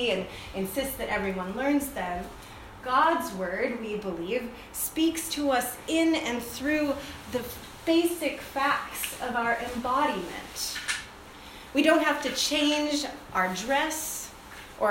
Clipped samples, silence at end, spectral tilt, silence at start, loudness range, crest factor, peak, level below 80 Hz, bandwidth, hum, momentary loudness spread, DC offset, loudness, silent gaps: under 0.1%; 0 s; -3 dB/octave; 0 s; 3 LU; 20 dB; -8 dBFS; -52 dBFS; 16.5 kHz; none; 12 LU; under 0.1%; -28 LUFS; none